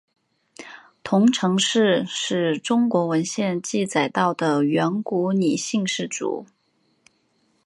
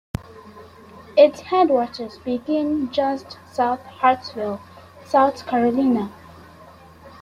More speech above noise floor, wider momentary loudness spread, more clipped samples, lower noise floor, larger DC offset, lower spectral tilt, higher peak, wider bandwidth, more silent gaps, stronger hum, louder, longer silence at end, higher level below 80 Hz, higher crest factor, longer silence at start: first, 46 dB vs 26 dB; second, 10 LU vs 15 LU; neither; first, -67 dBFS vs -45 dBFS; neither; second, -4.5 dB/octave vs -6.5 dB/octave; second, -6 dBFS vs -2 dBFS; second, 11.5 kHz vs 13 kHz; neither; neither; about the same, -22 LUFS vs -21 LUFS; first, 1.2 s vs 0.1 s; second, -70 dBFS vs -54 dBFS; about the same, 16 dB vs 20 dB; first, 0.6 s vs 0.2 s